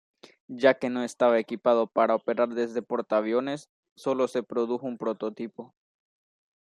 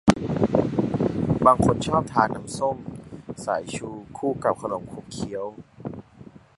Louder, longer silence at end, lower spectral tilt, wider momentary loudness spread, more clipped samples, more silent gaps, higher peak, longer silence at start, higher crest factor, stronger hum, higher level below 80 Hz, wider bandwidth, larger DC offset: second, -27 LUFS vs -24 LUFS; first, 1 s vs 0.35 s; about the same, -5.5 dB/octave vs -6.5 dB/octave; second, 11 LU vs 18 LU; neither; first, 3.69-3.83 s, 3.91-3.96 s vs none; second, -6 dBFS vs 0 dBFS; first, 0.5 s vs 0.05 s; about the same, 22 dB vs 24 dB; neither; second, -78 dBFS vs -46 dBFS; about the same, 11.5 kHz vs 11.5 kHz; neither